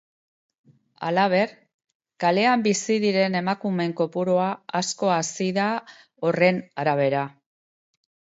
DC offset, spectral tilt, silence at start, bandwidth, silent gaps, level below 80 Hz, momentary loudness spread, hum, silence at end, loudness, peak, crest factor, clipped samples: under 0.1%; -4.5 dB/octave; 1 s; 8 kHz; 1.74-1.79 s, 1.95-2.00 s; -72 dBFS; 7 LU; none; 1 s; -23 LUFS; -6 dBFS; 18 dB; under 0.1%